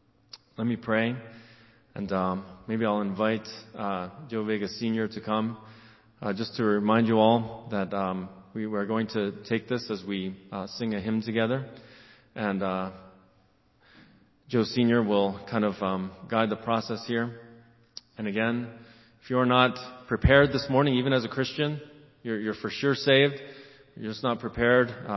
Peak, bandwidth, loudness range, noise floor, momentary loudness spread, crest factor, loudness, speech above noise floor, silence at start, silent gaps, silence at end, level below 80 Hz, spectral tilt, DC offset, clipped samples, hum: -4 dBFS; 6.2 kHz; 7 LU; -64 dBFS; 16 LU; 24 dB; -27 LUFS; 37 dB; 0.35 s; none; 0 s; -48 dBFS; -7 dB/octave; under 0.1%; under 0.1%; none